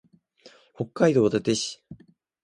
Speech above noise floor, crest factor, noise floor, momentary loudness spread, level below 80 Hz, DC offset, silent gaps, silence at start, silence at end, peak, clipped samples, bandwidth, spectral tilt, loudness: 32 dB; 20 dB; -55 dBFS; 15 LU; -62 dBFS; under 0.1%; none; 0.45 s; 0.5 s; -6 dBFS; under 0.1%; 11 kHz; -5 dB/octave; -24 LUFS